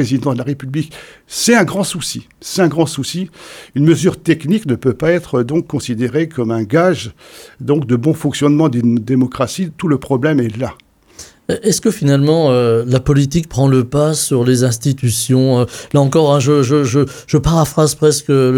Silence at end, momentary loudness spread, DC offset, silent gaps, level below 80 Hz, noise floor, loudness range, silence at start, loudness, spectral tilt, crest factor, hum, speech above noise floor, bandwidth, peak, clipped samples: 0 s; 10 LU; under 0.1%; none; -40 dBFS; -39 dBFS; 4 LU; 0 s; -14 LUFS; -6 dB/octave; 14 dB; none; 26 dB; 17.5 kHz; 0 dBFS; under 0.1%